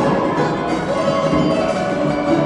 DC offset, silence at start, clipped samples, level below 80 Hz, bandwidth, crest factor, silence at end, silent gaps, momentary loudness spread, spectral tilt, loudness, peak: under 0.1%; 0 s; under 0.1%; -42 dBFS; 11.5 kHz; 12 dB; 0 s; none; 2 LU; -6.5 dB/octave; -18 LUFS; -6 dBFS